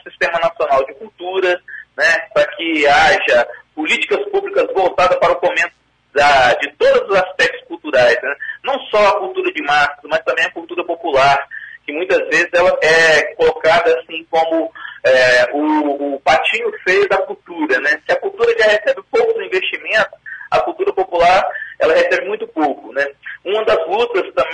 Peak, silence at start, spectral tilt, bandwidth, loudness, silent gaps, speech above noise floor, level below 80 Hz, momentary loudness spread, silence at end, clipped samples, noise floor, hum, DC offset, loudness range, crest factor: -2 dBFS; 0.05 s; -3 dB/octave; 10.5 kHz; -15 LUFS; none; 27 dB; -48 dBFS; 10 LU; 0 s; under 0.1%; -39 dBFS; none; under 0.1%; 3 LU; 14 dB